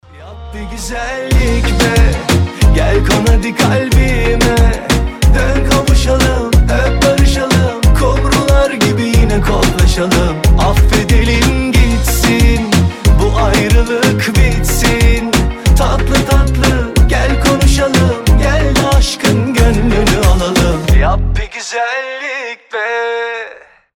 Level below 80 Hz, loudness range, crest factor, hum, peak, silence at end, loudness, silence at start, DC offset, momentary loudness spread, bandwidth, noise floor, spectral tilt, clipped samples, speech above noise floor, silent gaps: -14 dBFS; 2 LU; 10 dB; none; 0 dBFS; 0.45 s; -12 LUFS; 0.15 s; under 0.1%; 7 LU; 17 kHz; -35 dBFS; -5 dB/octave; under 0.1%; 24 dB; none